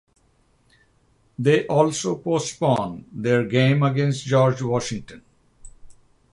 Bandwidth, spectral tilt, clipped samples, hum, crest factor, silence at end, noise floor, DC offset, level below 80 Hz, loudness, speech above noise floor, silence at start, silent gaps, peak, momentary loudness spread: 11.5 kHz; -6 dB/octave; under 0.1%; none; 18 dB; 0.4 s; -62 dBFS; under 0.1%; -56 dBFS; -21 LUFS; 41 dB; 1.4 s; none; -4 dBFS; 10 LU